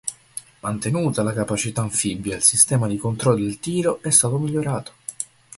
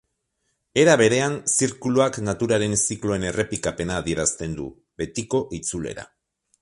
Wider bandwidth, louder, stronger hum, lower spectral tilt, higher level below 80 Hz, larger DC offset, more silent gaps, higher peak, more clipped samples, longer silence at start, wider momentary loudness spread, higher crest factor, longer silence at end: about the same, 12 kHz vs 11.5 kHz; about the same, -20 LUFS vs -22 LUFS; neither; about the same, -4 dB/octave vs -4 dB/octave; about the same, -52 dBFS vs -48 dBFS; neither; neither; first, 0 dBFS vs -4 dBFS; neither; second, 0.05 s vs 0.75 s; about the same, 15 LU vs 14 LU; about the same, 22 dB vs 20 dB; second, 0.35 s vs 0.55 s